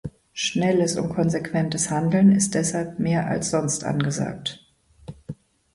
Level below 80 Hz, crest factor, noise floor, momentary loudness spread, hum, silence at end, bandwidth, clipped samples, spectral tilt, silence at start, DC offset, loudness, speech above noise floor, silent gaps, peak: -54 dBFS; 16 dB; -43 dBFS; 21 LU; none; 0.4 s; 11.5 kHz; under 0.1%; -5 dB/octave; 0.05 s; under 0.1%; -22 LUFS; 21 dB; none; -6 dBFS